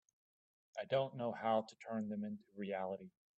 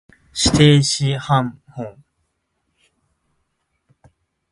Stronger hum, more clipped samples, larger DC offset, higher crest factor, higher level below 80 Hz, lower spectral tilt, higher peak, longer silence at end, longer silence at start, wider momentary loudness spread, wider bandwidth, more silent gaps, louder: neither; neither; neither; about the same, 18 dB vs 20 dB; second, -86 dBFS vs -42 dBFS; first, -7 dB/octave vs -5 dB/octave; second, -24 dBFS vs 0 dBFS; second, 0.3 s vs 2.6 s; first, 0.75 s vs 0.35 s; second, 11 LU vs 21 LU; second, 8.2 kHz vs 11.5 kHz; neither; second, -42 LUFS vs -16 LUFS